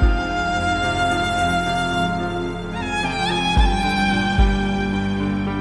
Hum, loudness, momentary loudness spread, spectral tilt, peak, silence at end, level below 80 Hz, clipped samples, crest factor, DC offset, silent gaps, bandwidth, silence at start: none; -20 LUFS; 5 LU; -5.5 dB/octave; -2 dBFS; 0 s; -24 dBFS; under 0.1%; 16 dB; under 0.1%; none; 11 kHz; 0 s